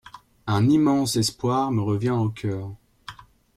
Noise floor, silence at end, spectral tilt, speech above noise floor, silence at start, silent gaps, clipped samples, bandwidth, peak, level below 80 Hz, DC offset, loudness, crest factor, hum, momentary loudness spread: -44 dBFS; 0.45 s; -6 dB/octave; 23 dB; 0.05 s; none; under 0.1%; 16 kHz; -10 dBFS; -56 dBFS; under 0.1%; -23 LUFS; 14 dB; none; 23 LU